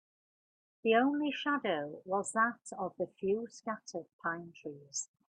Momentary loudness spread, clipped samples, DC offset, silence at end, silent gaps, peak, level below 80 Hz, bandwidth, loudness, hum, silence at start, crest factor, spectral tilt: 13 LU; under 0.1%; under 0.1%; 0.3 s; 4.13-4.19 s; -16 dBFS; -80 dBFS; 10.5 kHz; -35 LUFS; none; 0.85 s; 20 dB; -3.5 dB/octave